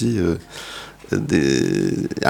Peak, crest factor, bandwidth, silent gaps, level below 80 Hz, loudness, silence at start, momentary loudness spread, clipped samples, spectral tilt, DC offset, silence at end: 0 dBFS; 20 dB; 17.5 kHz; none; -44 dBFS; -20 LUFS; 0 s; 15 LU; under 0.1%; -5.5 dB/octave; under 0.1%; 0 s